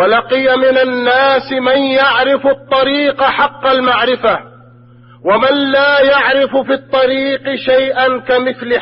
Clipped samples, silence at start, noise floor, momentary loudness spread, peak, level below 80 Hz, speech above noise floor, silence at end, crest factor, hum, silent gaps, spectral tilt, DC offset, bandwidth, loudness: under 0.1%; 0 s; -40 dBFS; 5 LU; 0 dBFS; -50 dBFS; 29 dB; 0 s; 12 dB; none; none; -9 dB/octave; under 0.1%; 5.8 kHz; -12 LUFS